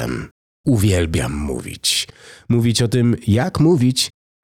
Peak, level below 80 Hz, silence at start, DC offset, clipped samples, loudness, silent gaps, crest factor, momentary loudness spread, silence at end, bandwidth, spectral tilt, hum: -6 dBFS; -38 dBFS; 0 s; under 0.1%; under 0.1%; -18 LUFS; 0.31-0.64 s; 12 dB; 10 LU; 0.35 s; 16.5 kHz; -5 dB/octave; none